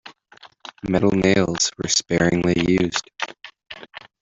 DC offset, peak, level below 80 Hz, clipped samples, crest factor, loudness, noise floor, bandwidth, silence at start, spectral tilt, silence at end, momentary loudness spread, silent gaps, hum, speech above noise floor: under 0.1%; -4 dBFS; -48 dBFS; under 0.1%; 18 dB; -20 LUFS; -50 dBFS; 7.8 kHz; 0.05 s; -4 dB/octave; 0.25 s; 21 LU; none; none; 31 dB